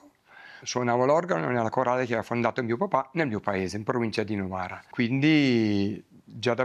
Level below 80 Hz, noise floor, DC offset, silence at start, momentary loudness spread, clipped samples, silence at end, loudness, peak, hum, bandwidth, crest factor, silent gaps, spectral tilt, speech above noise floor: -68 dBFS; -52 dBFS; under 0.1%; 0.35 s; 10 LU; under 0.1%; 0 s; -26 LUFS; -8 dBFS; none; 11.5 kHz; 18 dB; none; -6 dB/octave; 26 dB